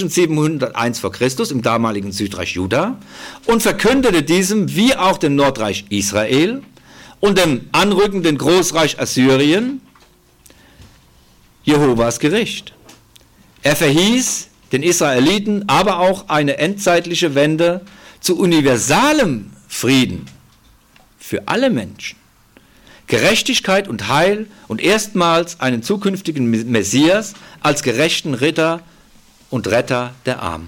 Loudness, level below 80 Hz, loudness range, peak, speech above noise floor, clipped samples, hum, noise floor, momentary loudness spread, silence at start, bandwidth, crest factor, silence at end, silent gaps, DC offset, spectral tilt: -16 LUFS; -46 dBFS; 4 LU; -2 dBFS; 35 dB; under 0.1%; none; -50 dBFS; 10 LU; 0 s; 17.5 kHz; 14 dB; 0 s; none; under 0.1%; -4 dB/octave